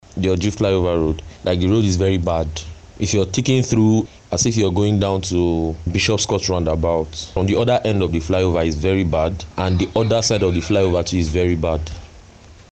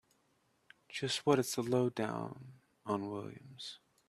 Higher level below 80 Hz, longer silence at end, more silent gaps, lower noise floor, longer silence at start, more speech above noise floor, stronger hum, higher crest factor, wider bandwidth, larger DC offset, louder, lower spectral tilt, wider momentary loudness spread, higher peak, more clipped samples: first, -34 dBFS vs -76 dBFS; second, 0.2 s vs 0.35 s; neither; second, -44 dBFS vs -75 dBFS; second, 0.15 s vs 0.9 s; second, 26 dB vs 39 dB; neither; second, 12 dB vs 24 dB; second, 8.8 kHz vs 14 kHz; first, 0.2% vs under 0.1%; first, -19 LUFS vs -36 LUFS; about the same, -5.5 dB/octave vs -5 dB/octave; second, 6 LU vs 16 LU; first, -6 dBFS vs -14 dBFS; neither